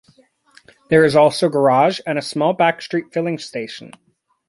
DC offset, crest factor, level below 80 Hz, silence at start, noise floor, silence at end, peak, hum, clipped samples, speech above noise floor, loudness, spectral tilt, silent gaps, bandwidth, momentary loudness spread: under 0.1%; 18 dB; -60 dBFS; 0.9 s; -55 dBFS; 0.6 s; -2 dBFS; none; under 0.1%; 38 dB; -17 LUFS; -5.5 dB/octave; none; 11.5 kHz; 14 LU